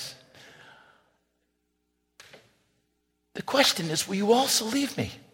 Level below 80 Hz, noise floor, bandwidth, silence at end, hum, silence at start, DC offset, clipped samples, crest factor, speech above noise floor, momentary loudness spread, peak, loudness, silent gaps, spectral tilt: -66 dBFS; -76 dBFS; 17 kHz; 0.15 s; 60 Hz at -65 dBFS; 0 s; under 0.1%; under 0.1%; 22 dB; 50 dB; 17 LU; -8 dBFS; -24 LUFS; none; -3 dB/octave